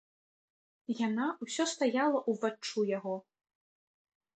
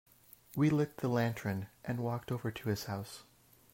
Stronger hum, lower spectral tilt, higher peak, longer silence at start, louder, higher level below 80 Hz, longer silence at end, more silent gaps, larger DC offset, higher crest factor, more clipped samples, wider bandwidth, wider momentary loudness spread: neither; second, -4 dB/octave vs -7 dB/octave; about the same, -18 dBFS vs -20 dBFS; first, 0.9 s vs 0.55 s; first, -33 LUFS vs -36 LUFS; second, -84 dBFS vs -68 dBFS; first, 1.2 s vs 0.5 s; neither; neither; about the same, 18 dB vs 16 dB; neither; second, 9 kHz vs 16 kHz; about the same, 10 LU vs 12 LU